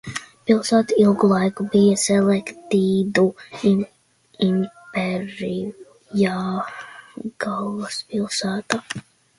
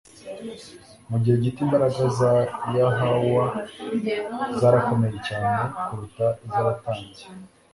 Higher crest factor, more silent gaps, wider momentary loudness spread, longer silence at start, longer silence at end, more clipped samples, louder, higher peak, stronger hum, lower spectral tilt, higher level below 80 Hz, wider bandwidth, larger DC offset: about the same, 20 dB vs 18 dB; neither; about the same, 15 LU vs 17 LU; second, 0.05 s vs 0.25 s; first, 0.4 s vs 0.25 s; neither; about the same, -21 LUFS vs -23 LUFS; first, 0 dBFS vs -4 dBFS; neither; second, -5.5 dB/octave vs -7.5 dB/octave; second, -60 dBFS vs -54 dBFS; about the same, 11.5 kHz vs 11.5 kHz; neither